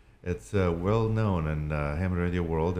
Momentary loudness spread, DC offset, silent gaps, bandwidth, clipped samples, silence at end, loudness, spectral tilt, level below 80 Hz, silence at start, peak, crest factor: 5 LU; under 0.1%; none; 11 kHz; under 0.1%; 0 s; -29 LUFS; -8.5 dB/octave; -40 dBFS; 0.25 s; -12 dBFS; 16 dB